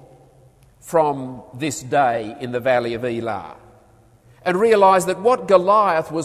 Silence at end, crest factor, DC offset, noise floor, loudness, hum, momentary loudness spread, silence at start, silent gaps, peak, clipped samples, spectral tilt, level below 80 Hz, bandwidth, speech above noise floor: 0 s; 18 dB; under 0.1%; -52 dBFS; -18 LUFS; none; 14 LU; 0.85 s; none; 0 dBFS; under 0.1%; -5 dB/octave; -56 dBFS; 15 kHz; 34 dB